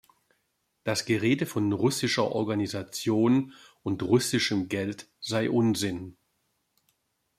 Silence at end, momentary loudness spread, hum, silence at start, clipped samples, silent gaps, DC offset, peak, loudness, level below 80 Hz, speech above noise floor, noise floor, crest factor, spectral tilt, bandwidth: 1.25 s; 12 LU; none; 0.85 s; under 0.1%; none; under 0.1%; -10 dBFS; -27 LUFS; -66 dBFS; 49 dB; -76 dBFS; 18 dB; -5 dB/octave; 15.5 kHz